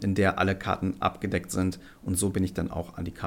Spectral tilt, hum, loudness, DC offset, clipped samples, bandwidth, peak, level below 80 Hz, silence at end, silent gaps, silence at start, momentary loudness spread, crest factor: -5.5 dB/octave; none; -28 LUFS; under 0.1%; under 0.1%; 17 kHz; -10 dBFS; -48 dBFS; 0 s; none; 0 s; 9 LU; 18 dB